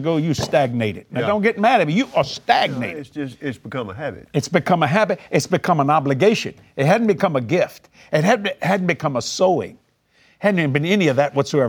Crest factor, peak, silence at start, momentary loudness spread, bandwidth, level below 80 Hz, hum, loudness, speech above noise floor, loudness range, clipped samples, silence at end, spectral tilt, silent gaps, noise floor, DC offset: 20 dB; 0 dBFS; 0 s; 11 LU; 19 kHz; -58 dBFS; none; -19 LUFS; 39 dB; 3 LU; under 0.1%; 0 s; -5.5 dB/octave; none; -58 dBFS; under 0.1%